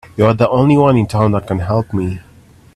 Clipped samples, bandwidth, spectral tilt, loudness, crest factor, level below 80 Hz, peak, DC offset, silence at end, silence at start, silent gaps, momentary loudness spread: under 0.1%; 12.5 kHz; -8.5 dB/octave; -14 LUFS; 14 dB; -42 dBFS; 0 dBFS; under 0.1%; 0.55 s; 0.15 s; none; 10 LU